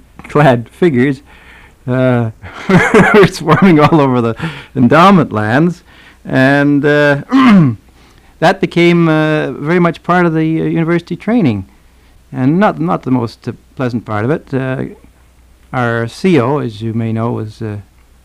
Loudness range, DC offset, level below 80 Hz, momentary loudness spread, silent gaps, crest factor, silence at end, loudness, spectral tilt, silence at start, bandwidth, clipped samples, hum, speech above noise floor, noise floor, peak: 7 LU; under 0.1%; -42 dBFS; 15 LU; none; 12 dB; 0.4 s; -12 LUFS; -7.5 dB/octave; 0.3 s; 13 kHz; under 0.1%; none; 34 dB; -45 dBFS; 0 dBFS